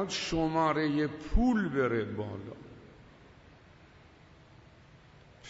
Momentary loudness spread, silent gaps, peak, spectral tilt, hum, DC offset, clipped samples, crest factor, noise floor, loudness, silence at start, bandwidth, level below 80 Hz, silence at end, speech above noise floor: 20 LU; none; -14 dBFS; -5.5 dB/octave; none; under 0.1%; under 0.1%; 20 dB; -57 dBFS; -30 LUFS; 0 s; 8 kHz; -42 dBFS; 0 s; 27 dB